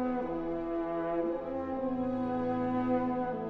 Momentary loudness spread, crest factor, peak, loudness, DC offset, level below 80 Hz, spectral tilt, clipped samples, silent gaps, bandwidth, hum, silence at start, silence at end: 4 LU; 14 dB; -18 dBFS; -33 LUFS; under 0.1%; -54 dBFS; -9.5 dB/octave; under 0.1%; none; 4.9 kHz; none; 0 s; 0 s